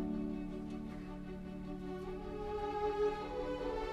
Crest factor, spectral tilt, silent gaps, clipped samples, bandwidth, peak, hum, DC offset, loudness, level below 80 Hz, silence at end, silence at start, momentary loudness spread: 16 dB; -7.5 dB/octave; none; under 0.1%; 12.5 kHz; -24 dBFS; none; under 0.1%; -41 LUFS; -52 dBFS; 0 s; 0 s; 10 LU